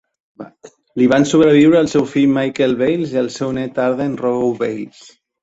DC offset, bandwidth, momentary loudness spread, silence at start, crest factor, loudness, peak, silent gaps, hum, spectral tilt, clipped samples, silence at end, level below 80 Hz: under 0.1%; 8 kHz; 15 LU; 0.4 s; 14 dB; -15 LUFS; -2 dBFS; none; none; -6 dB/octave; under 0.1%; 0.55 s; -54 dBFS